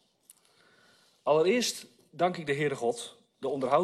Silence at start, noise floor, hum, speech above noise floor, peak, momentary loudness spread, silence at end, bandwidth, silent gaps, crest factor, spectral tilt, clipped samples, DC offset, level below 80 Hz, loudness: 1.25 s; -64 dBFS; none; 36 dB; -12 dBFS; 15 LU; 0 s; 13.5 kHz; none; 20 dB; -4 dB/octave; under 0.1%; under 0.1%; -74 dBFS; -29 LUFS